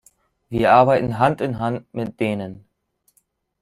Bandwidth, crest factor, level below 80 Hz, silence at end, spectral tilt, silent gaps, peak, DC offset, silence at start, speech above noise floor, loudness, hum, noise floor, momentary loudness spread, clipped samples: 14 kHz; 20 dB; -50 dBFS; 1.05 s; -7.5 dB/octave; none; -2 dBFS; under 0.1%; 0.5 s; 48 dB; -19 LUFS; none; -67 dBFS; 15 LU; under 0.1%